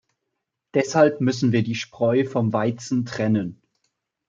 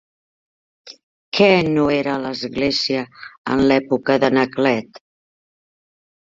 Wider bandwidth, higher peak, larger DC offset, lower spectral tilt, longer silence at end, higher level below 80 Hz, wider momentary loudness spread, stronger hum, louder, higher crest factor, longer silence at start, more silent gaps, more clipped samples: about the same, 7.8 kHz vs 7.6 kHz; about the same, -4 dBFS vs -2 dBFS; neither; about the same, -6.5 dB/octave vs -5.5 dB/octave; second, 0.75 s vs 1.5 s; second, -66 dBFS vs -52 dBFS; second, 8 LU vs 11 LU; neither; second, -22 LUFS vs -18 LUFS; about the same, 18 dB vs 18 dB; about the same, 0.75 s vs 0.85 s; second, none vs 1.03-1.32 s, 3.38-3.45 s; neither